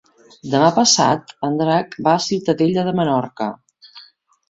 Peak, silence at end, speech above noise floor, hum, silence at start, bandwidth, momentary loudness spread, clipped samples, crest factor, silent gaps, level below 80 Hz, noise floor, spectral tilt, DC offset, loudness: -2 dBFS; 0.5 s; 31 dB; none; 0.45 s; 8 kHz; 12 LU; under 0.1%; 18 dB; none; -60 dBFS; -48 dBFS; -4 dB/octave; under 0.1%; -17 LUFS